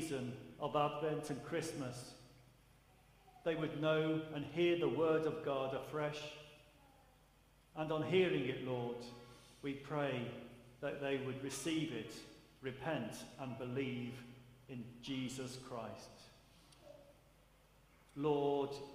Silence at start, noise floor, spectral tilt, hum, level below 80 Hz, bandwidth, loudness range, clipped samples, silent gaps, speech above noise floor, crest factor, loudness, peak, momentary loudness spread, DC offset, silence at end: 0 s; -68 dBFS; -5.5 dB/octave; none; -72 dBFS; 15.5 kHz; 9 LU; under 0.1%; none; 29 dB; 20 dB; -41 LUFS; -20 dBFS; 20 LU; under 0.1%; 0 s